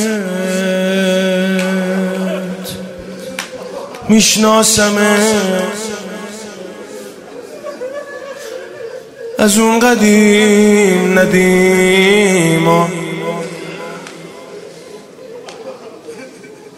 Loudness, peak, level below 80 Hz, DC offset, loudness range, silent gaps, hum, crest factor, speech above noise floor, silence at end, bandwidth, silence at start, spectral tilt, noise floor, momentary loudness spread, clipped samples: -11 LUFS; 0 dBFS; -48 dBFS; under 0.1%; 17 LU; none; none; 14 dB; 25 dB; 0 s; 16 kHz; 0 s; -4 dB/octave; -35 dBFS; 23 LU; under 0.1%